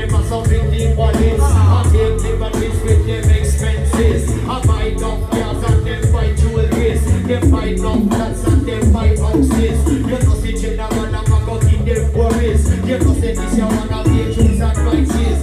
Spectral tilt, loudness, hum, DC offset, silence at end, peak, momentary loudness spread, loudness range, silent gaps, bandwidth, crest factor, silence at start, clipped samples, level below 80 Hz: -7 dB/octave; -15 LUFS; none; under 0.1%; 0 s; -2 dBFS; 5 LU; 2 LU; none; 13.5 kHz; 10 dB; 0 s; under 0.1%; -18 dBFS